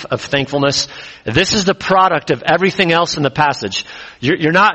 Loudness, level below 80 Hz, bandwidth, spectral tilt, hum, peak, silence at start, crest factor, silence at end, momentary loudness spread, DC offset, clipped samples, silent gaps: -15 LUFS; -46 dBFS; 8.4 kHz; -4 dB/octave; none; 0 dBFS; 0 s; 16 dB; 0 s; 9 LU; under 0.1%; under 0.1%; none